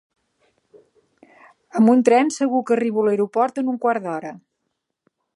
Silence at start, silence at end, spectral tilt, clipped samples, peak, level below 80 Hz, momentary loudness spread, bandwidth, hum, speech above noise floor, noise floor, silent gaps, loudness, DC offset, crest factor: 1.75 s; 0.95 s; -6 dB/octave; under 0.1%; -2 dBFS; -76 dBFS; 14 LU; 11.5 kHz; none; 58 dB; -77 dBFS; none; -19 LUFS; under 0.1%; 20 dB